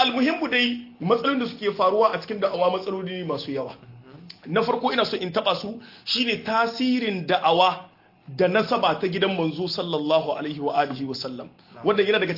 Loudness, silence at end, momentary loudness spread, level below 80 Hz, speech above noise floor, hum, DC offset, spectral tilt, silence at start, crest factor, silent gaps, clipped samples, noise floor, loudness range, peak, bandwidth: -23 LUFS; 0 s; 10 LU; -68 dBFS; 21 dB; none; under 0.1%; -6 dB/octave; 0 s; 18 dB; none; under 0.1%; -45 dBFS; 3 LU; -6 dBFS; 5.8 kHz